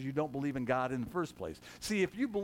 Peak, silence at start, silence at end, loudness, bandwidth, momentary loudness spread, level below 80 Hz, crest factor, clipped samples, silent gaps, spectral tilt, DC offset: -20 dBFS; 0 s; 0 s; -36 LUFS; 17 kHz; 10 LU; -62 dBFS; 16 dB; under 0.1%; none; -5.5 dB/octave; under 0.1%